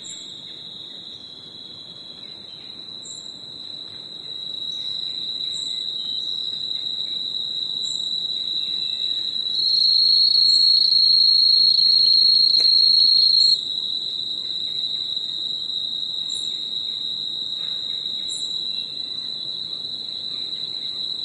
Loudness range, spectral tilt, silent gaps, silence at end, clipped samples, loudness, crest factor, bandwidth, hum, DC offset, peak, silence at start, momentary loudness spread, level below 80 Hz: 19 LU; 0 dB/octave; none; 0 s; under 0.1%; -18 LUFS; 16 dB; 11.5 kHz; none; under 0.1%; -6 dBFS; 0 s; 22 LU; -72 dBFS